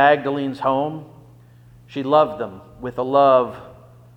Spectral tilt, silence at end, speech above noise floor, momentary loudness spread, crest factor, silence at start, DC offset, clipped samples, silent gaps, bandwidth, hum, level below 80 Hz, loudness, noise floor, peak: -7.5 dB/octave; 0.45 s; 28 dB; 18 LU; 18 dB; 0 s; under 0.1%; under 0.1%; none; 8.2 kHz; 60 Hz at -50 dBFS; -56 dBFS; -19 LUFS; -47 dBFS; -2 dBFS